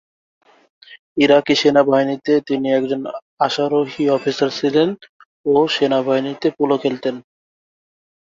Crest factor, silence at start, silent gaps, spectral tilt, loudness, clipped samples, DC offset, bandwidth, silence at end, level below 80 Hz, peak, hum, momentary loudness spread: 16 dB; 0.9 s; 0.99-1.16 s, 3.22-3.37 s, 5.09-5.20 s, 5.26-5.44 s; -5.5 dB/octave; -17 LUFS; under 0.1%; under 0.1%; 7.6 kHz; 1.05 s; -62 dBFS; -2 dBFS; none; 11 LU